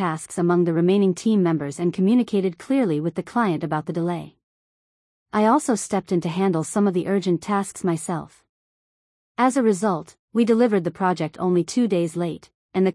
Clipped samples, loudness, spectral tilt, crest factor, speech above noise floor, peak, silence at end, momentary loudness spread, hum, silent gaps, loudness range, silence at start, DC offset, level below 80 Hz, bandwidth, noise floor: under 0.1%; -22 LUFS; -6.5 dB/octave; 14 dB; over 69 dB; -8 dBFS; 0 s; 9 LU; none; 4.43-5.26 s, 8.49-9.35 s, 10.19-10.28 s, 12.54-12.69 s; 3 LU; 0 s; under 0.1%; -66 dBFS; 12 kHz; under -90 dBFS